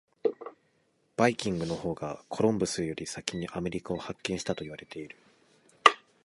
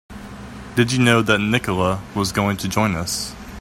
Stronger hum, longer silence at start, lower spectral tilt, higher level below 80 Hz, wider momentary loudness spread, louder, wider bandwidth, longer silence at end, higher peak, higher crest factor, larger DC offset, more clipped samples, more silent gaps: neither; first, 0.25 s vs 0.1 s; about the same, -4.5 dB/octave vs -4.5 dB/octave; second, -60 dBFS vs -44 dBFS; about the same, 19 LU vs 19 LU; second, -30 LUFS vs -19 LUFS; second, 11.5 kHz vs 16.5 kHz; first, 0.25 s vs 0 s; about the same, -2 dBFS vs 0 dBFS; first, 30 dB vs 20 dB; neither; neither; neither